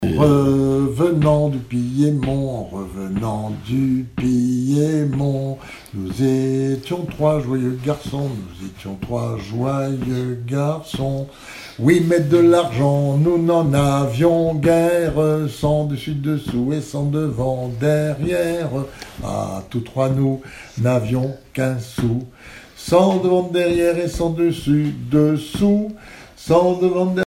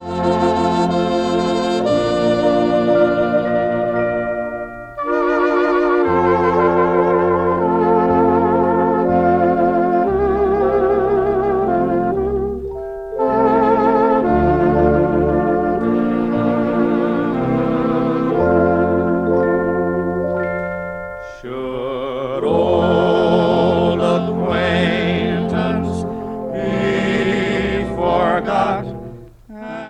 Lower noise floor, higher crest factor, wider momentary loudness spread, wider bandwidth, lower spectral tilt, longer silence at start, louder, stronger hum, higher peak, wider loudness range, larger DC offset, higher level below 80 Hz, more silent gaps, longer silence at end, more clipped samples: first, -40 dBFS vs -36 dBFS; about the same, 18 dB vs 16 dB; first, 12 LU vs 9 LU; first, 15.5 kHz vs 9 kHz; about the same, -7.5 dB/octave vs -7.5 dB/octave; about the same, 0 s vs 0 s; about the same, -19 LUFS vs -17 LUFS; neither; about the same, -2 dBFS vs 0 dBFS; about the same, 6 LU vs 4 LU; neither; about the same, -42 dBFS vs -38 dBFS; neither; about the same, 0 s vs 0 s; neither